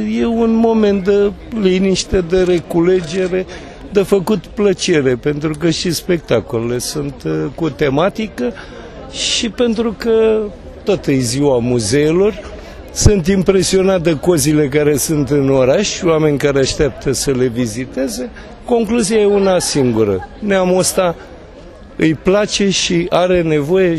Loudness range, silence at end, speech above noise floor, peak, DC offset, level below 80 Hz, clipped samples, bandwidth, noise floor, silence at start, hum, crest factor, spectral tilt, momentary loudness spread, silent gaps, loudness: 4 LU; 0 s; 22 dB; 0 dBFS; under 0.1%; -34 dBFS; under 0.1%; 13.5 kHz; -36 dBFS; 0 s; none; 14 dB; -5 dB/octave; 8 LU; none; -15 LUFS